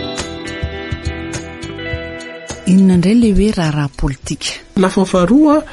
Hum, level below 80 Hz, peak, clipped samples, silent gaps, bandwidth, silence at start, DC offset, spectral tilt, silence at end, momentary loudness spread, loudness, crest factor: none; -28 dBFS; 0 dBFS; under 0.1%; none; 11.5 kHz; 0 s; under 0.1%; -6 dB/octave; 0 s; 15 LU; -15 LUFS; 14 dB